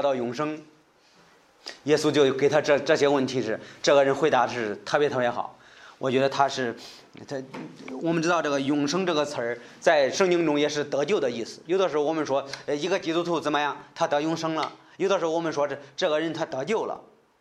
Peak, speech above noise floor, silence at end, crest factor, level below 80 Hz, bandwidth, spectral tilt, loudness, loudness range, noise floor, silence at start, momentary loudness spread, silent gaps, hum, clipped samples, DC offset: -6 dBFS; 34 dB; 0.4 s; 20 dB; -70 dBFS; 12 kHz; -4.5 dB/octave; -25 LUFS; 5 LU; -59 dBFS; 0 s; 13 LU; none; none; under 0.1%; under 0.1%